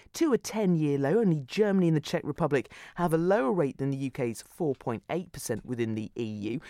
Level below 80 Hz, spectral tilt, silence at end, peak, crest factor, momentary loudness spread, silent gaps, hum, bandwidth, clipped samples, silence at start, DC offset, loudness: -60 dBFS; -6.5 dB/octave; 0 s; -12 dBFS; 16 dB; 9 LU; none; none; 16 kHz; under 0.1%; 0.15 s; under 0.1%; -29 LUFS